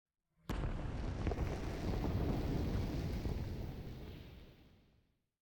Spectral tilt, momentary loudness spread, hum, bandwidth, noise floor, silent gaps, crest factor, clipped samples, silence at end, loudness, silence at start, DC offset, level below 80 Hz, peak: -7.5 dB/octave; 15 LU; none; 19 kHz; -76 dBFS; none; 16 dB; under 0.1%; 0.75 s; -41 LUFS; 0.5 s; under 0.1%; -46 dBFS; -26 dBFS